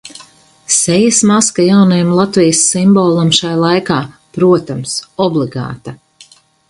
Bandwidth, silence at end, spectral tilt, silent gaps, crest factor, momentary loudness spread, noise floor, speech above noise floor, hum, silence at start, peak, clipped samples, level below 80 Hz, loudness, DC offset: 11.5 kHz; 0.75 s; -4.5 dB/octave; none; 12 dB; 11 LU; -44 dBFS; 33 dB; none; 0.05 s; 0 dBFS; under 0.1%; -50 dBFS; -11 LUFS; under 0.1%